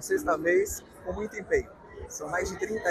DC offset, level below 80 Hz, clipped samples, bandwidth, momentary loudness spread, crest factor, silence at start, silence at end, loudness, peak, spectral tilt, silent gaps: under 0.1%; -50 dBFS; under 0.1%; 15 kHz; 14 LU; 16 dB; 0 s; 0 s; -30 LUFS; -14 dBFS; -4.5 dB/octave; none